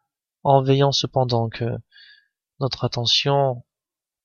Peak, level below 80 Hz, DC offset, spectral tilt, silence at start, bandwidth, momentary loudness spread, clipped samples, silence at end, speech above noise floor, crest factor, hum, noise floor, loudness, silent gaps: -2 dBFS; -56 dBFS; under 0.1%; -5.5 dB/octave; 0.45 s; 7.2 kHz; 11 LU; under 0.1%; 0.65 s; 68 dB; 20 dB; none; -89 dBFS; -20 LUFS; none